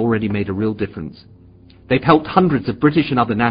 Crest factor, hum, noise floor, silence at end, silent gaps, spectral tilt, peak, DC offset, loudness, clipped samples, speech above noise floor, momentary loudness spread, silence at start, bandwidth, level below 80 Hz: 18 dB; none; -45 dBFS; 0 s; none; -11.5 dB/octave; 0 dBFS; under 0.1%; -17 LUFS; under 0.1%; 28 dB; 11 LU; 0 s; 5.2 kHz; -44 dBFS